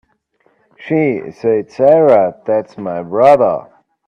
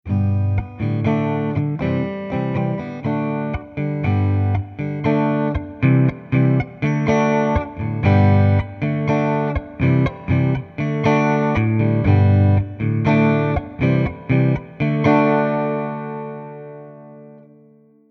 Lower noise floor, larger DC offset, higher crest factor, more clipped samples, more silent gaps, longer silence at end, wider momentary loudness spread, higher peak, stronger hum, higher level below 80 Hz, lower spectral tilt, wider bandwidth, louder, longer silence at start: first, -59 dBFS vs -51 dBFS; neither; about the same, 14 dB vs 16 dB; neither; neither; second, 0.5 s vs 0.7 s; about the same, 11 LU vs 9 LU; about the same, 0 dBFS vs -2 dBFS; neither; second, -58 dBFS vs -38 dBFS; about the same, -8.5 dB/octave vs -9 dB/octave; about the same, 6.8 kHz vs 6.2 kHz; first, -13 LUFS vs -19 LUFS; first, 0.8 s vs 0.05 s